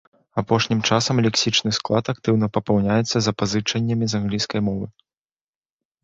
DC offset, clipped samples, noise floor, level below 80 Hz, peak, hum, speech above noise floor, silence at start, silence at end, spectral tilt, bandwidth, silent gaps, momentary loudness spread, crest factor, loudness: under 0.1%; under 0.1%; under -90 dBFS; -50 dBFS; -4 dBFS; none; over 69 dB; 0.35 s; 1.15 s; -5 dB/octave; 8 kHz; none; 6 LU; 18 dB; -21 LUFS